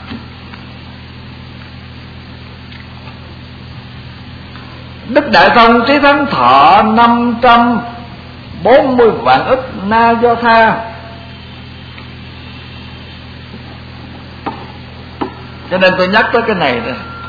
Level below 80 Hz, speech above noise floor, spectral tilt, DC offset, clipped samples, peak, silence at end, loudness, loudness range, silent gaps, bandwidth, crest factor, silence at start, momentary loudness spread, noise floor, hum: -38 dBFS; 22 dB; -7 dB/octave; under 0.1%; 0.2%; 0 dBFS; 0 s; -9 LUFS; 22 LU; none; 5.4 kHz; 14 dB; 0 s; 24 LU; -31 dBFS; none